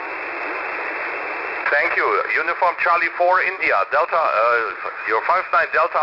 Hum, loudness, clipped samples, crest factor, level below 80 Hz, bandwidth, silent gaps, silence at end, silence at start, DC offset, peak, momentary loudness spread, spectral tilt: none; -19 LUFS; under 0.1%; 14 dB; -62 dBFS; 5.8 kHz; none; 0 s; 0 s; under 0.1%; -6 dBFS; 8 LU; -4 dB/octave